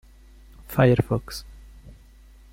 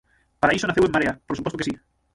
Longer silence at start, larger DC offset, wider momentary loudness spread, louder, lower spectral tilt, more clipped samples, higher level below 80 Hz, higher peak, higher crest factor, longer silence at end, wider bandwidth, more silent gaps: first, 0.7 s vs 0.4 s; neither; first, 18 LU vs 10 LU; about the same, -22 LUFS vs -23 LUFS; first, -7.5 dB/octave vs -5 dB/octave; neither; about the same, -44 dBFS vs -48 dBFS; about the same, -6 dBFS vs -4 dBFS; about the same, 20 dB vs 20 dB; first, 0.6 s vs 0.4 s; first, 16.5 kHz vs 11.5 kHz; neither